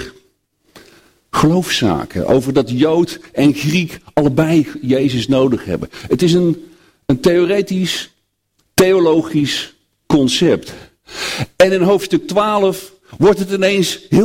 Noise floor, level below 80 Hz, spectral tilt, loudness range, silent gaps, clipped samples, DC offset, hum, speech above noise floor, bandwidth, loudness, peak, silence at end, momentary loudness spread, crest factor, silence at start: -64 dBFS; -44 dBFS; -5.5 dB/octave; 1 LU; none; under 0.1%; under 0.1%; none; 50 dB; 16.5 kHz; -15 LUFS; 0 dBFS; 0 s; 9 LU; 16 dB; 0 s